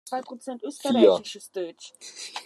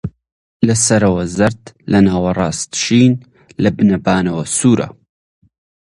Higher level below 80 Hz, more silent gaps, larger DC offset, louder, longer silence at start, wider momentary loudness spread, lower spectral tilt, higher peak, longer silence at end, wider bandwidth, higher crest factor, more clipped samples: second, -84 dBFS vs -40 dBFS; second, none vs 0.32-0.60 s; neither; second, -24 LUFS vs -14 LUFS; about the same, 0.05 s vs 0.05 s; first, 19 LU vs 9 LU; about the same, -4 dB/octave vs -5 dB/octave; second, -4 dBFS vs 0 dBFS; second, 0.05 s vs 0.95 s; first, 13 kHz vs 11.5 kHz; first, 22 dB vs 16 dB; neither